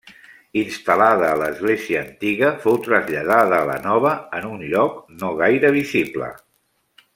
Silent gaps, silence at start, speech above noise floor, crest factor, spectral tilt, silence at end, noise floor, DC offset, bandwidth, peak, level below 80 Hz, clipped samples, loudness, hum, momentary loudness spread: none; 0.05 s; 48 dB; 18 dB; -6 dB/octave; 0.8 s; -66 dBFS; under 0.1%; 16.5 kHz; -2 dBFS; -60 dBFS; under 0.1%; -19 LUFS; none; 11 LU